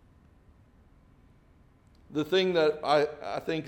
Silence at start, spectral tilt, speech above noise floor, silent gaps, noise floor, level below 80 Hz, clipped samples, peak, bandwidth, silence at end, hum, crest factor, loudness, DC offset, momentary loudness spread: 2.1 s; -5.5 dB/octave; 33 dB; none; -60 dBFS; -62 dBFS; under 0.1%; -12 dBFS; 17.5 kHz; 0 s; none; 20 dB; -28 LUFS; under 0.1%; 10 LU